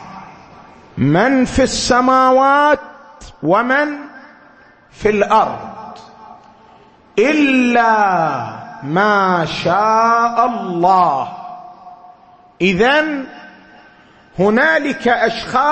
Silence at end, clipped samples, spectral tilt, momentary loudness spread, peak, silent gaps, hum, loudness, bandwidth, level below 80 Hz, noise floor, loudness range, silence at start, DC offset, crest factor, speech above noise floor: 0 s; under 0.1%; -5 dB/octave; 19 LU; 0 dBFS; none; none; -14 LUFS; 8.8 kHz; -44 dBFS; -46 dBFS; 5 LU; 0 s; under 0.1%; 16 dB; 32 dB